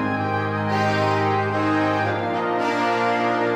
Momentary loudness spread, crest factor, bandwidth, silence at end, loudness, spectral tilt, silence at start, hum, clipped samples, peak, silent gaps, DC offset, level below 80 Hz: 3 LU; 12 dB; 11.5 kHz; 0 s; -21 LUFS; -6.5 dB/octave; 0 s; none; under 0.1%; -8 dBFS; none; under 0.1%; -60 dBFS